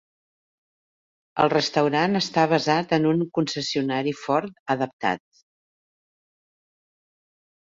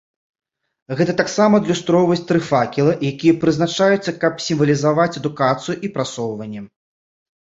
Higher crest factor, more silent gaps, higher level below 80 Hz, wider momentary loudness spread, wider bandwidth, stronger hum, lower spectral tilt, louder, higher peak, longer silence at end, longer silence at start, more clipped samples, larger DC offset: first, 22 dB vs 16 dB; first, 4.59-4.66 s, 4.93-4.99 s vs none; second, -66 dBFS vs -56 dBFS; second, 6 LU vs 9 LU; about the same, 7.8 kHz vs 8 kHz; neither; about the same, -5 dB/octave vs -6 dB/octave; second, -23 LUFS vs -18 LUFS; about the same, -4 dBFS vs -2 dBFS; first, 2.45 s vs 0.9 s; first, 1.35 s vs 0.9 s; neither; neither